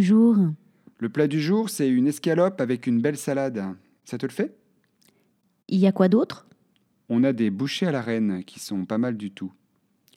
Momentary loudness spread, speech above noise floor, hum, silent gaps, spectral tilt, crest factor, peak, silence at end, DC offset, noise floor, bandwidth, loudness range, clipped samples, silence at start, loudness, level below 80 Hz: 14 LU; 45 dB; none; none; -6.5 dB/octave; 18 dB; -6 dBFS; 0.65 s; under 0.1%; -68 dBFS; 15 kHz; 3 LU; under 0.1%; 0 s; -24 LUFS; -80 dBFS